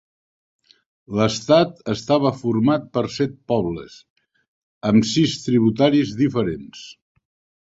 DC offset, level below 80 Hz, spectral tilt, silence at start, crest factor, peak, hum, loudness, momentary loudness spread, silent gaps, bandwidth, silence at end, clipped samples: under 0.1%; -52 dBFS; -6 dB/octave; 1.1 s; 20 dB; -2 dBFS; none; -20 LUFS; 11 LU; 4.10-4.16 s, 4.48-4.81 s; 8 kHz; 0.8 s; under 0.1%